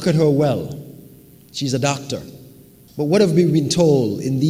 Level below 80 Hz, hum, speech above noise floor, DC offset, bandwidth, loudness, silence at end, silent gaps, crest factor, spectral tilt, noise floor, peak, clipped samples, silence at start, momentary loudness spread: -52 dBFS; none; 28 dB; under 0.1%; 16 kHz; -18 LUFS; 0 s; none; 16 dB; -6 dB/octave; -45 dBFS; -2 dBFS; under 0.1%; 0 s; 17 LU